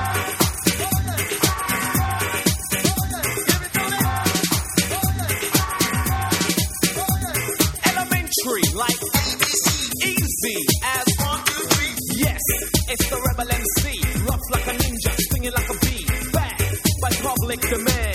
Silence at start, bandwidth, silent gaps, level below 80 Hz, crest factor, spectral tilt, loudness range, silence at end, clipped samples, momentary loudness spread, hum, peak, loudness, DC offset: 0 s; 17.5 kHz; none; -32 dBFS; 22 dB; -3 dB/octave; 2 LU; 0 s; under 0.1%; 4 LU; none; 0 dBFS; -20 LUFS; under 0.1%